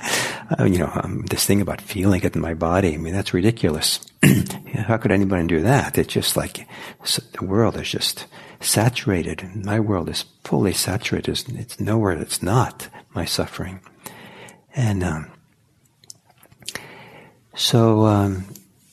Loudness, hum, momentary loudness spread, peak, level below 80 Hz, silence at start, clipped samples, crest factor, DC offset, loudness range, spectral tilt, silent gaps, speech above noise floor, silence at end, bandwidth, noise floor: -21 LUFS; none; 16 LU; -2 dBFS; -48 dBFS; 0 s; under 0.1%; 20 dB; under 0.1%; 8 LU; -5 dB/octave; none; 39 dB; 0.35 s; 14 kHz; -60 dBFS